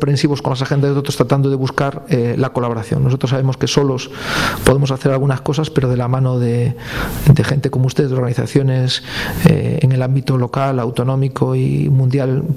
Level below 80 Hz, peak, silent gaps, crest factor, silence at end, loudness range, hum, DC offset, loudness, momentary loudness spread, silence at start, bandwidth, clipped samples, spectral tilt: -38 dBFS; 0 dBFS; none; 16 dB; 0 s; 1 LU; none; under 0.1%; -16 LUFS; 5 LU; 0 s; 15 kHz; under 0.1%; -6.5 dB/octave